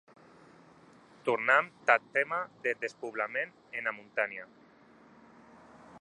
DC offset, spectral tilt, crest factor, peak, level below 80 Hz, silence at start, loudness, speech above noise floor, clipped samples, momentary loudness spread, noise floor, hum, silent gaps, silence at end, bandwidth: under 0.1%; -4 dB/octave; 28 dB; -6 dBFS; -82 dBFS; 1.25 s; -31 LUFS; 27 dB; under 0.1%; 11 LU; -59 dBFS; none; none; 0 s; 10.5 kHz